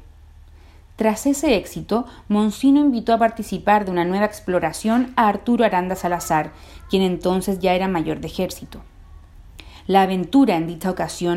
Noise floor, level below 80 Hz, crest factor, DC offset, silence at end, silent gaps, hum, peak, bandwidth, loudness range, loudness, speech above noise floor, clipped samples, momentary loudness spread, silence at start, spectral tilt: -45 dBFS; -44 dBFS; 18 dB; under 0.1%; 0 s; none; none; -2 dBFS; 16 kHz; 4 LU; -20 LUFS; 26 dB; under 0.1%; 8 LU; 0 s; -5.5 dB/octave